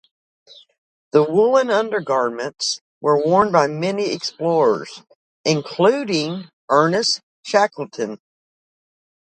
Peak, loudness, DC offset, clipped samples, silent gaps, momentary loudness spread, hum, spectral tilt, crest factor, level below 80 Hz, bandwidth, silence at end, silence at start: -2 dBFS; -19 LUFS; under 0.1%; under 0.1%; 2.81-3.01 s, 5.15-5.44 s, 6.53-6.68 s, 7.23-7.43 s; 11 LU; none; -4.5 dB/octave; 18 dB; -64 dBFS; 9.2 kHz; 1.2 s; 1.15 s